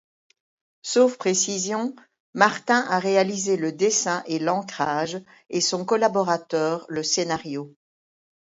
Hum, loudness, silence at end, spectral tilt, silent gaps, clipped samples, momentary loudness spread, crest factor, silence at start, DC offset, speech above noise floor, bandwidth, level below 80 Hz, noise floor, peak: none; -23 LUFS; 0.8 s; -3 dB/octave; 2.20-2.33 s; under 0.1%; 10 LU; 24 dB; 0.85 s; under 0.1%; over 67 dB; 8 kHz; -70 dBFS; under -90 dBFS; 0 dBFS